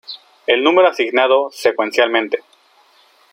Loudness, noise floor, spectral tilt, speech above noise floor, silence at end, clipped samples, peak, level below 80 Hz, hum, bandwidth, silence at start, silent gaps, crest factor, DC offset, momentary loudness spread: -15 LUFS; -53 dBFS; -3 dB/octave; 38 dB; 0.95 s; under 0.1%; 0 dBFS; -68 dBFS; none; 16 kHz; 0.1 s; none; 16 dB; under 0.1%; 12 LU